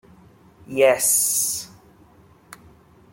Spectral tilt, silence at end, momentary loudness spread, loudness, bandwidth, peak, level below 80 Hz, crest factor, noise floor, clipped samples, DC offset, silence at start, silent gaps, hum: -1 dB/octave; 1.45 s; 14 LU; -19 LUFS; 17 kHz; -4 dBFS; -62 dBFS; 20 dB; -52 dBFS; under 0.1%; under 0.1%; 0.7 s; none; none